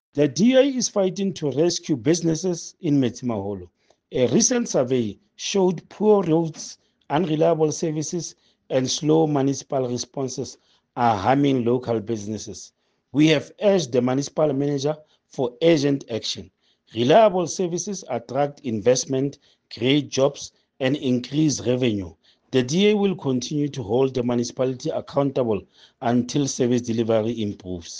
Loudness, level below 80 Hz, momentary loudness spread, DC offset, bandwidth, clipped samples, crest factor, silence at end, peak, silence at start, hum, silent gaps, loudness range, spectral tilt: -22 LUFS; -60 dBFS; 11 LU; under 0.1%; 10.5 kHz; under 0.1%; 18 dB; 0 s; -4 dBFS; 0.15 s; none; none; 2 LU; -5 dB/octave